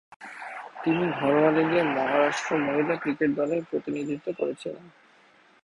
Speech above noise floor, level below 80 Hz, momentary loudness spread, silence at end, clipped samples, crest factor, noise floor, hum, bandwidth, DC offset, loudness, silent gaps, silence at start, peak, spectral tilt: 33 dB; -68 dBFS; 17 LU; 0.75 s; under 0.1%; 18 dB; -58 dBFS; none; 11 kHz; under 0.1%; -26 LUFS; none; 0.2 s; -8 dBFS; -6 dB/octave